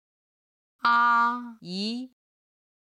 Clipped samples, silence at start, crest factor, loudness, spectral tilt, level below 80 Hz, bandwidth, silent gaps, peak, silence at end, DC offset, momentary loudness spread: under 0.1%; 0.85 s; 18 dB; -24 LUFS; -4 dB/octave; -80 dBFS; 11 kHz; none; -10 dBFS; 0.8 s; under 0.1%; 16 LU